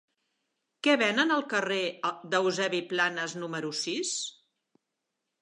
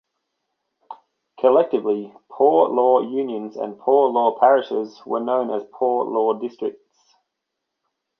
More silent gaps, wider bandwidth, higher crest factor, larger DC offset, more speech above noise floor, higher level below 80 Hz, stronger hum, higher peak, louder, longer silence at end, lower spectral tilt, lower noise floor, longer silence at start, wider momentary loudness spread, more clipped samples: neither; first, 11 kHz vs 6.2 kHz; about the same, 22 dB vs 18 dB; neither; second, 55 dB vs 61 dB; second, -86 dBFS vs -76 dBFS; neither; second, -10 dBFS vs -2 dBFS; second, -28 LUFS vs -20 LUFS; second, 1.1 s vs 1.5 s; second, -2.5 dB/octave vs -7.5 dB/octave; first, -84 dBFS vs -80 dBFS; about the same, 0.85 s vs 0.9 s; about the same, 10 LU vs 11 LU; neither